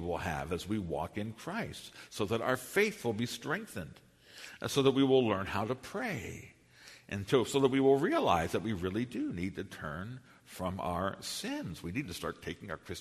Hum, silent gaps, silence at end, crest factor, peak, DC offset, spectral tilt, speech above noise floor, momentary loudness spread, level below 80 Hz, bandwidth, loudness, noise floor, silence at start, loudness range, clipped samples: none; none; 0 s; 22 dB; -12 dBFS; under 0.1%; -5 dB/octave; 24 dB; 17 LU; -60 dBFS; 13.5 kHz; -34 LUFS; -57 dBFS; 0 s; 7 LU; under 0.1%